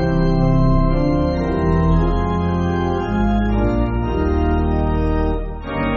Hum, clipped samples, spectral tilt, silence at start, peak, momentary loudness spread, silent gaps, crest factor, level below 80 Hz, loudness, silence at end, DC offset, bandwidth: none; under 0.1%; -8 dB/octave; 0 s; -4 dBFS; 4 LU; none; 12 dB; -22 dBFS; -19 LUFS; 0 s; under 0.1%; 6.6 kHz